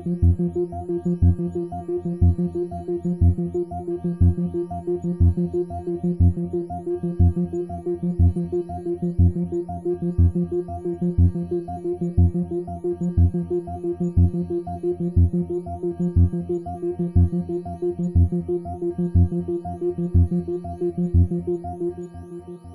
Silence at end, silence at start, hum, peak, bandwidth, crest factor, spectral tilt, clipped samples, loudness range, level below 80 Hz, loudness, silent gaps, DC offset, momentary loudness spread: 0 s; 0 s; none; -8 dBFS; 1.7 kHz; 14 dB; -12 dB/octave; under 0.1%; 0 LU; -36 dBFS; -23 LUFS; none; under 0.1%; 8 LU